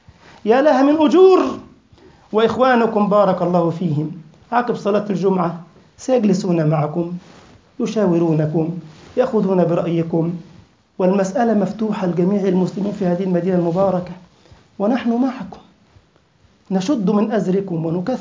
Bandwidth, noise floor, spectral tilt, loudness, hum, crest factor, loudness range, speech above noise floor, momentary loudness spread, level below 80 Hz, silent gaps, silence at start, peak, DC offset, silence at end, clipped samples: 7.6 kHz; -55 dBFS; -7.5 dB/octave; -18 LUFS; none; 16 dB; 6 LU; 39 dB; 11 LU; -56 dBFS; none; 0.45 s; -2 dBFS; under 0.1%; 0 s; under 0.1%